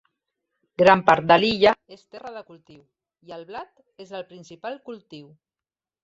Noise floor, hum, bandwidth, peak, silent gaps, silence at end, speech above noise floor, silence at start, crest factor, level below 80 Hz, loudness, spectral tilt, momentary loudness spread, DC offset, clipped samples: under -90 dBFS; none; 7.8 kHz; -2 dBFS; none; 0.85 s; over 67 dB; 0.8 s; 24 dB; -60 dBFS; -18 LUFS; -5.5 dB/octave; 24 LU; under 0.1%; under 0.1%